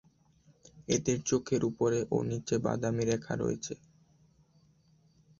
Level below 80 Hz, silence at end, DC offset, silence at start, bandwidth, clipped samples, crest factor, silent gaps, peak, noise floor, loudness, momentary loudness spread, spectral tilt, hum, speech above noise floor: -60 dBFS; 1.65 s; under 0.1%; 0.75 s; 7.8 kHz; under 0.1%; 20 dB; none; -14 dBFS; -66 dBFS; -32 LUFS; 8 LU; -5.5 dB/octave; none; 35 dB